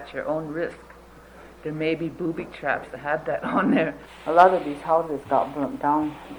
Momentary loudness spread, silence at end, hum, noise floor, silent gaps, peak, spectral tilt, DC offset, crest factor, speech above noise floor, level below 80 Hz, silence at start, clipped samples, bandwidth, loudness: 12 LU; 0 s; none; -47 dBFS; none; -4 dBFS; -7 dB/octave; under 0.1%; 22 dB; 23 dB; -54 dBFS; 0 s; under 0.1%; over 20 kHz; -24 LUFS